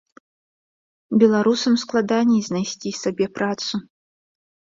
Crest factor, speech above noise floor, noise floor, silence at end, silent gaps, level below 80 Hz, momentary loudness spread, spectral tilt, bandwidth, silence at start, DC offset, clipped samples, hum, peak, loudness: 18 dB; over 70 dB; under -90 dBFS; 0.95 s; none; -64 dBFS; 10 LU; -5 dB/octave; 7.6 kHz; 1.1 s; under 0.1%; under 0.1%; none; -4 dBFS; -20 LUFS